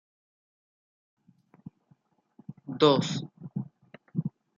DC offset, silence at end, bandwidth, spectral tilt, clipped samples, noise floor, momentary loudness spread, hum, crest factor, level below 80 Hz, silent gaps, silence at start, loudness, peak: under 0.1%; 0.3 s; 7.6 kHz; -6 dB/octave; under 0.1%; -67 dBFS; 24 LU; none; 24 dB; -74 dBFS; none; 2.5 s; -28 LUFS; -8 dBFS